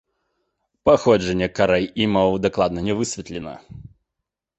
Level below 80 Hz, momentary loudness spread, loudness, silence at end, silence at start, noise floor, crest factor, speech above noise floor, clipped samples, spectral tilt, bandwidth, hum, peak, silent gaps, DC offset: -46 dBFS; 16 LU; -20 LUFS; 0.7 s; 0.85 s; -83 dBFS; 20 dB; 63 dB; under 0.1%; -5.5 dB/octave; 8.4 kHz; none; -2 dBFS; none; under 0.1%